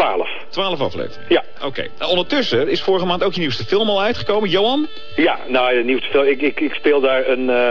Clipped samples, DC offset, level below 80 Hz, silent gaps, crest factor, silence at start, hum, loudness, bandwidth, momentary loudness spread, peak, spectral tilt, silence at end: under 0.1%; 5%; -50 dBFS; none; 16 dB; 0 s; none; -18 LUFS; 7 kHz; 7 LU; 0 dBFS; -5.5 dB/octave; 0 s